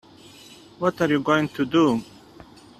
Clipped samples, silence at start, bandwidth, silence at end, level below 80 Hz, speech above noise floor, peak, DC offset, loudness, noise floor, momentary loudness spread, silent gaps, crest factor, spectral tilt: under 0.1%; 0.8 s; 13.5 kHz; 0.75 s; -60 dBFS; 26 dB; -4 dBFS; under 0.1%; -22 LUFS; -47 dBFS; 6 LU; none; 20 dB; -6 dB/octave